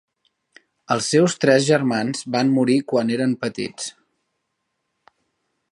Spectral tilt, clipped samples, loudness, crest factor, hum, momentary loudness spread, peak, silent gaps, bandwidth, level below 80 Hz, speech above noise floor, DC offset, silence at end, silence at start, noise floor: -5 dB/octave; under 0.1%; -20 LUFS; 20 dB; none; 12 LU; -2 dBFS; none; 11.5 kHz; -68 dBFS; 56 dB; under 0.1%; 1.8 s; 0.9 s; -76 dBFS